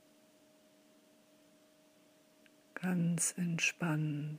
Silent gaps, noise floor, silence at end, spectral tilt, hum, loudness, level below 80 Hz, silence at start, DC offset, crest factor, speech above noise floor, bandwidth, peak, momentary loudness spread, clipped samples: none; -67 dBFS; 0 s; -4 dB/octave; none; -34 LUFS; -86 dBFS; 2.75 s; under 0.1%; 20 dB; 32 dB; 15.5 kHz; -20 dBFS; 7 LU; under 0.1%